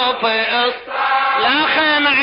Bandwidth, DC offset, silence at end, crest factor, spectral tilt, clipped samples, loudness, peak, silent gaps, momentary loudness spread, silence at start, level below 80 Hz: 5.4 kHz; under 0.1%; 0 s; 12 dB; -7 dB/octave; under 0.1%; -15 LUFS; -4 dBFS; none; 5 LU; 0 s; -56 dBFS